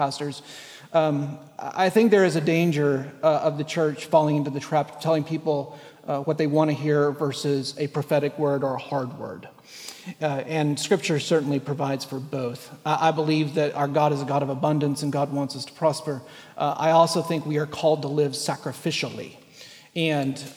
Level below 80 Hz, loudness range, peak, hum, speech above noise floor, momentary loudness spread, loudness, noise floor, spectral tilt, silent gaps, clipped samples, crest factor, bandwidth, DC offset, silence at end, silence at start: -72 dBFS; 4 LU; -6 dBFS; none; 24 dB; 13 LU; -24 LUFS; -47 dBFS; -6 dB/octave; none; under 0.1%; 18 dB; 16 kHz; under 0.1%; 0 s; 0 s